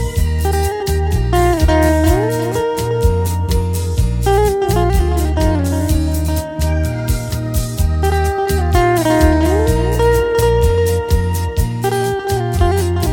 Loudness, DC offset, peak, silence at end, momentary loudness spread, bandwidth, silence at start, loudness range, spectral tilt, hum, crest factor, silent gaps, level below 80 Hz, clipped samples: -16 LUFS; under 0.1%; 0 dBFS; 0 s; 5 LU; 17.5 kHz; 0 s; 3 LU; -6 dB/octave; none; 14 dB; none; -20 dBFS; under 0.1%